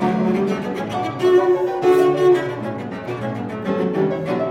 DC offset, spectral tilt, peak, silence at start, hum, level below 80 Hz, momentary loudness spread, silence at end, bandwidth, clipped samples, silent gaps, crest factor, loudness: under 0.1%; -7.5 dB/octave; -4 dBFS; 0 s; none; -56 dBFS; 11 LU; 0 s; 12 kHz; under 0.1%; none; 14 dB; -19 LUFS